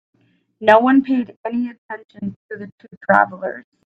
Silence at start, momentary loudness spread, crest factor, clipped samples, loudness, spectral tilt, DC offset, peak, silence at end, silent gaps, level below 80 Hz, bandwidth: 0.6 s; 21 LU; 18 dB; under 0.1%; -17 LUFS; -7.5 dB/octave; under 0.1%; 0 dBFS; 0.25 s; 1.36-1.44 s, 1.78-1.89 s, 2.05-2.09 s, 2.36-2.49 s, 2.72-2.78 s, 2.97-3.01 s; -66 dBFS; 6.2 kHz